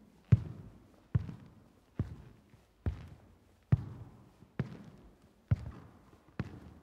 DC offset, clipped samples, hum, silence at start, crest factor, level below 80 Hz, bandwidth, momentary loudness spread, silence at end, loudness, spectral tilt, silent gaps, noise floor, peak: under 0.1%; under 0.1%; none; 0.3 s; 26 dB; -52 dBFS; 6.2 kHz; 25 LU; 0.05 s; -37 LUFS; -9.5 dB/octave; none; -63 dBFS; -12 dBFS